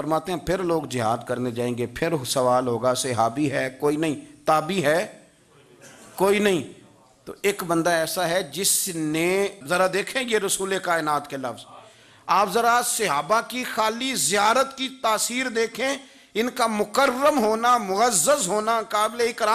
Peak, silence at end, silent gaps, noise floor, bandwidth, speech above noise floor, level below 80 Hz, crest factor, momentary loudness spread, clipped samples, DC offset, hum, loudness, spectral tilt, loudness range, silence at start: -6 dBFS; 0 s; none; -54 dBFS; 15.5 kHz; 32 dB; -58 dBFS; 16 dB; 8 LU; under 0.1%; under 0.1%; none; -23 LUFS; -3 dB/octave; 3 LU; 0 s